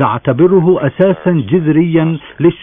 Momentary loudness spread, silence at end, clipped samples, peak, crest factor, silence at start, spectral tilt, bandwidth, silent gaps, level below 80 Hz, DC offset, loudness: 5 LU; 0 s; under 0.1%; 0 dBFS; 12 dB; 0 s; -11.5 dB/octave; 3.7 kHz; none; -48 dBFS; under 0.1%; -12 LUFS